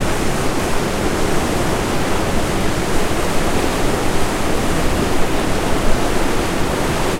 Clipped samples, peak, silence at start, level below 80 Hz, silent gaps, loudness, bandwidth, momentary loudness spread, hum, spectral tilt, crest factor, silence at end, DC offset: under 0.1%; -2 dBFS; 0 s; -22 dBFS; none; -19 LUFS; 16 kHz; 1 LU; none; -4.5 dB/octave; 14 dB; 0 s; under 0.1%